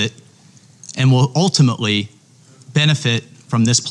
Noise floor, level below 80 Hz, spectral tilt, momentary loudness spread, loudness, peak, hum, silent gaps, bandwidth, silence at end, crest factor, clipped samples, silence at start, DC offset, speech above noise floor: -47 dBFS; -60 dBFS; -4.5 dB/octave; 9 LU; -16 LUFS; -2 dBFS; none; none; 11 kHz; 0 s; 14 dB; under 0.1%; 0 s; under 0.1%; 33 dB